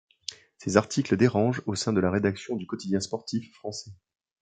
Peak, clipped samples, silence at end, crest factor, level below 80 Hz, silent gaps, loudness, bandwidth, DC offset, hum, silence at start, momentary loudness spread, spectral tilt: -4 dBFS; under 0.1%; 0.5 s; 24 dB; -54 dBFS; none; -27 LUFS; 9.4 kHz; under 0.1%; none; 0.3 s; 15 LU; -5.5 dB/octave